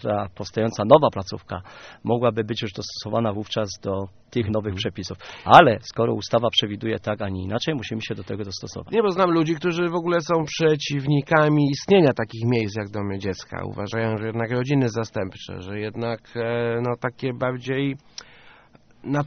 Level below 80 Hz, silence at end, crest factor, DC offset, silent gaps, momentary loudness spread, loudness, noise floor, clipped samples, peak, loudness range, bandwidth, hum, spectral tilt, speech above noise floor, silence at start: -56 dBFS; 0 s; 22 dB; under 0.1%; none; 14 LU; -23 LUFS; -53 dBFS; under 0.1%; 0 dBFS; 7 LU; 6.6 kHz; none; -4.5 dB/octave; 30 dB; 0 s